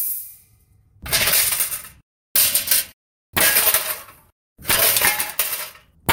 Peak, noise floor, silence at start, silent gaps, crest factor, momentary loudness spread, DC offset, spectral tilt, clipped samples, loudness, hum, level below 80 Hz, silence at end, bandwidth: 0 dBFS; -56 dBFS; 0 s; 2.03-2.35 s, 2.93-3.33 s, 4.32-4.56 s; 22 dB; 16 LU; under 0.1%; 0 dB/octave; under 0.1%; -17 LUFS; none; -48 dBFS; 0 s; 19 kHz